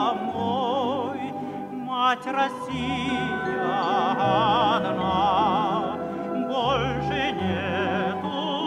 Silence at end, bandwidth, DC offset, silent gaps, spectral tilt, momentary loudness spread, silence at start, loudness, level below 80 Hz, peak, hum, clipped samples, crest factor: 0 s; 12 kHz; under 0.1%; none; -6 dB/octave; 8 LU; 0 s; -25 LUFS; -50 dBFS; -10 dBFS; none; under 0.1%; 16 dB